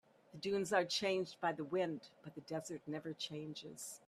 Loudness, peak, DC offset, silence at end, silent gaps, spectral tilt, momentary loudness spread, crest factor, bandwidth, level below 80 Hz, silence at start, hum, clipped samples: -41 LUFS; -20 dBFS; under 0.1%; 0.1 s; none; -4 dB/octave; 13 LU; 22 dB; 14 kHz; -82 dBFS; 0.35 s; none; under 0.1%